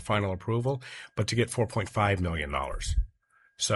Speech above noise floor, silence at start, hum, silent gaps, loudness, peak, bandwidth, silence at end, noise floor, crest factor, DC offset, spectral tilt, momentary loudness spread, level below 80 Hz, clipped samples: 36 dB; 0 s; none; none; -30 LUFS; -12 dBFS; 11.5 kHz; 0 s; -65 dBFS; 18 dB; under 0.1%; -4.5 dB/octave; 7 LU; -38 dBFS; under 0.1%